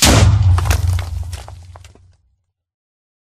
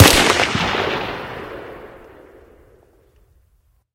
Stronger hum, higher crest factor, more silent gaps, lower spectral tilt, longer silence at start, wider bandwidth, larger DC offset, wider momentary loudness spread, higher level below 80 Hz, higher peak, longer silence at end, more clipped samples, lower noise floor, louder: neither; about the same, 16 dB vs 20 dB; neither; about the same, -4 dB/octave vs -3.5 dB/octave; about the same, 0 s vs 0 s; about the same, 15.5 kHz vs 17 kHz; neither; second, 20 LU vs 24 LU; first, -24 dBFS vs -36 dBFS; about the same, 0 dBFS vs 0 dBFS; second, 1.5 s vs 2 s; neither; first, -64 dBFS vs -59 dBFS; about the same, -15 LUFS vs -17 LUFS